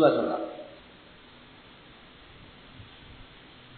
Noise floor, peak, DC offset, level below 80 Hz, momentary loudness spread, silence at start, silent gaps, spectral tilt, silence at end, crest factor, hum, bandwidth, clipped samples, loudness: -52 dBFS; -8 dBFS; under 0.1%; -60 dBFS; 21 LU; 0 s; none; -4.5 dB/octave; 0.55 s; 24 dB; none; 4.5 kHz; under 0.1%; -29 LUFS